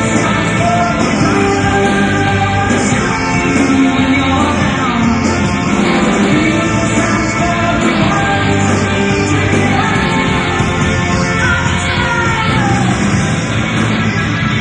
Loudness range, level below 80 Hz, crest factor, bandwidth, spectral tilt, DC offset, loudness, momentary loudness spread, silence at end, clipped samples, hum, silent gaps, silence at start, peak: 1 LU; -30 dBFS; 12 dB; 10.5 kHz; -5 dB/octave; under 0.1%; -12 LUFS; 2 LU; 0 s; under 0.1%; none; none; 0 s; 0 dBFS